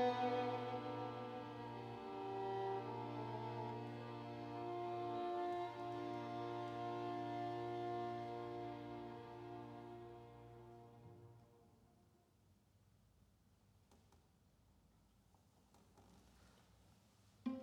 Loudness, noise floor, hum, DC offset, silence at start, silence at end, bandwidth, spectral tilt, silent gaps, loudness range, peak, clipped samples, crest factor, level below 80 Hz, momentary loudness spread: -47 LUFS; -74 dBFS; none; under 0.1%; 0 s; 0 s; 13.5 kHz; -7 dB/octave; none; 15 LU; -28 dBFS; under 0.1%; 20 dB; -78 dBFS; 16 LU